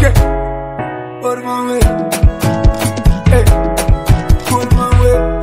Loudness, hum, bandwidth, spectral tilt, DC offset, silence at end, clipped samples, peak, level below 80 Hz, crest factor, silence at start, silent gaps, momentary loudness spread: -14 LUFS; none; 16.5 kHz; -6 dB/octave; under 0.1%; 0 s; 1%; 0 dBFS; -16 dBFS; 12 dB; 0 s; none; 10 LU